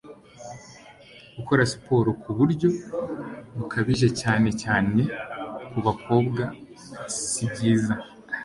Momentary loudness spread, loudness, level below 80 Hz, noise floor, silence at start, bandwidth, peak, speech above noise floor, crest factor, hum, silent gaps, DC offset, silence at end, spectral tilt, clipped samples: 18 LU; -25 LUFS; -52 dBFS; -49 dBFS; 0.05 s; 11.5 kHz; -6 dBFS; 25 dB; 20 dB; none; none; under 0.1%; 0 s; -5.5 dB/octave; under 0.1%